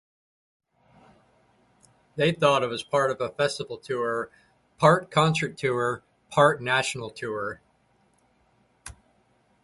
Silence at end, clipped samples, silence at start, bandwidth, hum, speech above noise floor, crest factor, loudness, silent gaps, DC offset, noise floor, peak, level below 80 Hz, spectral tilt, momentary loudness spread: 0.75 s; under 0.1%; 2.15 s; 11.5 kHz; none; 41 dB; 22 dB; -25 LUFS; none; under 0.1%; -66 dBFS; -4 dBFS; -62 dBFS; -5 dB/octave; 18 LU